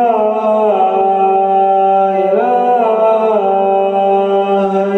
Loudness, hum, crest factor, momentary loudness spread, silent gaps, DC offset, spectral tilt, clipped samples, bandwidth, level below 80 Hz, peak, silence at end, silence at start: -12 LUFS; none; 8 dB; 2 LU; none; under 0.1%; -8 dB/octave; under 0.1%; 6.2 kHz; -64 dBFS; -2 dBFS; 0 s; 0 s